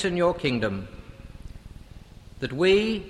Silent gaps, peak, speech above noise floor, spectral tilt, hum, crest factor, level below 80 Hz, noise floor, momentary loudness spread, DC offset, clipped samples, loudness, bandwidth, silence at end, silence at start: none; -10 dBFS; 22 dB; -6 dB/octave; none; 16 dB; -46 dBFS; -46 dBFS; 25 LU; under 0.1%; under 0.1%; -25 LUFS; 12 kHz; 0 s; 0 s